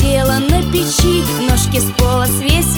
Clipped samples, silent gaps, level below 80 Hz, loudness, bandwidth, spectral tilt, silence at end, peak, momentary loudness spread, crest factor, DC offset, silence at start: under 0.1%; none; -20 dBFS; -13 LUFS; over 20 kHz; -4.5 dB/octave; 0 s; 0 dBFS; 2 LU; 12 dB; under 0.1%; 0 s